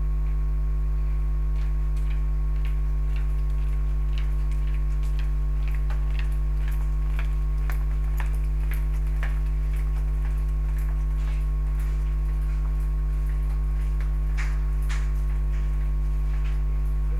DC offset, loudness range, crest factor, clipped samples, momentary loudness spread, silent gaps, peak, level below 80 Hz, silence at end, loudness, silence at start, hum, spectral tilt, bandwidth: 0.9%; 0 LU; 10 dB; under 0.1%; 0 LU; none; -12 dBFS; -24 dBFS; 0 s; -28 LUFS; 0 s; 50 Hz at -25 dBFS; -7.5 dB/octave; 4.3 kHz